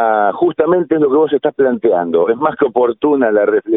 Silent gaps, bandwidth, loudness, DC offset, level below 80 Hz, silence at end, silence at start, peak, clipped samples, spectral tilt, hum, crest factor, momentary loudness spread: none; 3.9 kHz; -14 LUFS; under 0.1%; -56 dBFS; 0 s; 0 s; 0 dBFS; under 0.1%; -11.5 dB/octave; none; 12 dB; 2 LU